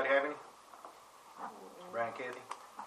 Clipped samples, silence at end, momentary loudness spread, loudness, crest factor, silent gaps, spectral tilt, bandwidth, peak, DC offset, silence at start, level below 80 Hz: under 0.1%; 0 s; 21 LU; -39 LUFS; 22 dB; none; -3.5 dB/octave; 14.5 kHz; -16 dBFS; under 0.1%; 0 s; -86 dBFS